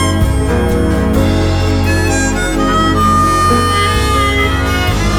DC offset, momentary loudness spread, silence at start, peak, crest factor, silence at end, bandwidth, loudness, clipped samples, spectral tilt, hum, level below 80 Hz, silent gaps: under 0.1%; 3 LU; 0 s; 0 dBFS; 10 dB; 0 s; 17.5 kHz; -12 LUFS; under 0.1%; -5 dB/octave; none; -18 dBFS; none